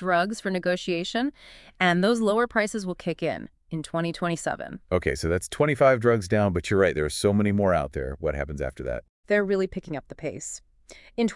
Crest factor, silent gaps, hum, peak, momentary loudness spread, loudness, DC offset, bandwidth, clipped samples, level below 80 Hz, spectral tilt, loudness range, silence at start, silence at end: 18 dB; 9.09-9.23 s; none; -8 dBFS; 13 LU; -25 LUFS; under 0.1%; 12 kHz; under 0.1%; -46 dBFS; -5.5 dB/octave; 5 LU; 0 s; 0 s